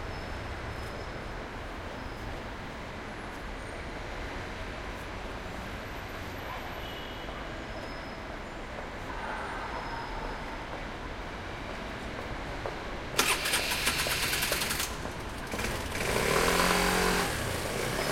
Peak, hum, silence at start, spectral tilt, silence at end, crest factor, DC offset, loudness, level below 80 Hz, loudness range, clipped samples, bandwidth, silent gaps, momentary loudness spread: -6 dBFS; none; 0 s; -3 dB/octave; 0 s; 26 dB; under 0.1%; -33 LUFS; -44 dBFS; 11 LU; under 0.1%; 16.5 kHz; none; 14 LU